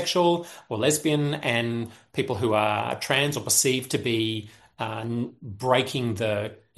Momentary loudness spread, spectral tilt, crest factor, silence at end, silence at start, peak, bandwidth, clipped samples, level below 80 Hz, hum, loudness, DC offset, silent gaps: 11 LU; -3.5 dB/octave; 20 dB; 0.2 s; 0 s; -6 dBFS; 12.5 kHz; under 0.1%; -64 dBFS; none; -25 LUFS; under 0.1%; none